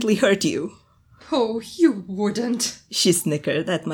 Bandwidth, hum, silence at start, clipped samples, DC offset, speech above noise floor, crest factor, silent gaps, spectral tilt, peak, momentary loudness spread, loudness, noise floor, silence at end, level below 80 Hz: 18.5 kHz; none; 0 s; under 0.1%; under 0.1%; 29 dB; 16 dB; none; -4 dB/octave; -6 dBFS; 7 LU; -22 LUFS; -51 dBFS; 0 s; -62 dBFS